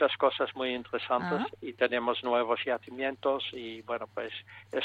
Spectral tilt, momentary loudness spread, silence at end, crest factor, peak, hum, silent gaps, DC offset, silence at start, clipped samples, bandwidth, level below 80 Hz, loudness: -6 dB/octave; 10 LU; 0 s; 20 dB; -12 dBFS; none; none; under 0.1%; 0 s; under 0.1%; 8 kHz; -72 dBFS; -31 LUFS